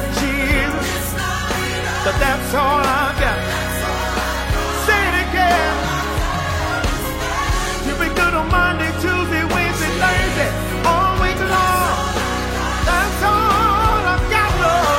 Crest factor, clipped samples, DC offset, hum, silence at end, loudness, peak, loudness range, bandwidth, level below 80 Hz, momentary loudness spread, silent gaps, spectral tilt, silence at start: 16 dB; under 0.1%; under 0.1%; none; 0 s; -17 LUFS; -2 dBFS; 2 LU; 16.5 kHz; -26 dBFS; 5 LU; none; -4 dB/octave; 0 s